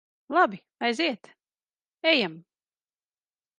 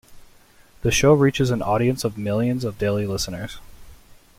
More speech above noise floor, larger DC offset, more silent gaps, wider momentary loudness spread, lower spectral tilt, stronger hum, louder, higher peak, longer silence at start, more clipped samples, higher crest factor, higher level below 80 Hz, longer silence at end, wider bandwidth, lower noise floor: first, over 65 dB vs 31 dB; neither; neither; second, 8 LU vs 12 LU; second, -4 dB/octave vs -5.5 dB/octave; neither; second, -25 LUFS vs -21 LUFS; second, -8 dBFS vs -4 dBFS; first, 0.3 s vs 0.1 s; neither; about the same, 22 dB vs 18 dB; second, -82 dBFS vs -42 dBFS; first, 1.2 s vs 0.45 s; second, 10.5 kHz vs 16.5 kHz; first, under -90 dBFS vs -51 dBFS